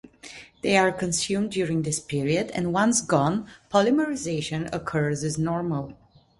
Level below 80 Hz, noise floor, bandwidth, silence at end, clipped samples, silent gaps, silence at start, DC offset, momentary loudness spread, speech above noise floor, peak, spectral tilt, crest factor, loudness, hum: -56 dBFS; -46 dBFS; 11.5 kHz; 0.45 s; under 0.1%; none; 0.05 s; under 0.1%; 10 LU; 21 dB; -4 dBFS; -4.5 dB/octave; 20 dB; -25 LUFS; none